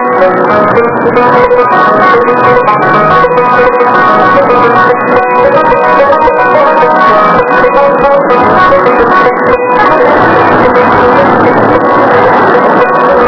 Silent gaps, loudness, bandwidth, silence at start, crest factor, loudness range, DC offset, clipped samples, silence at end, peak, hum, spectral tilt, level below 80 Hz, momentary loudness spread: none; -5 LUFS; 5.4 kHz; 0 s; 6 dB; 0 LU; 1%; 8%; 0 s; 0 dBFS; none; -7.5 dB/octave; -34 dBFS; 2 LU